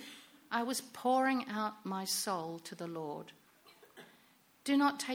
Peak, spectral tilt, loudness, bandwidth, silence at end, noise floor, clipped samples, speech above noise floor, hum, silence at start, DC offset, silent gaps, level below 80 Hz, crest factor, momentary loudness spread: -18 dBFS; -3 dB/octave; -35 LUFS; 17 kHz; 0 s; -67 dBFS; under 0.1%; 32 dB; none; 0 s; under 0.1%; none; -84 dBFS; 18 dB; 21 LU